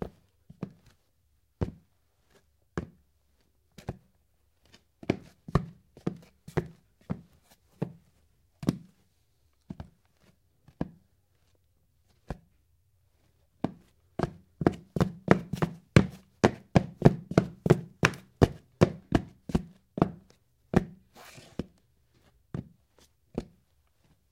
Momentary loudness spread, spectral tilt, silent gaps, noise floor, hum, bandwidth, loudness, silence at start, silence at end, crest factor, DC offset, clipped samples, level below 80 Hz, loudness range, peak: 20 LU; -7 dB/octave; none; -71 dBFS; none; 15.5 kHz; -30 LUFS; 0 s; 0.9 s; 32 dB; under 0.1%; under 0.1%; -48 dBFS; 20 LU; 0 dBFS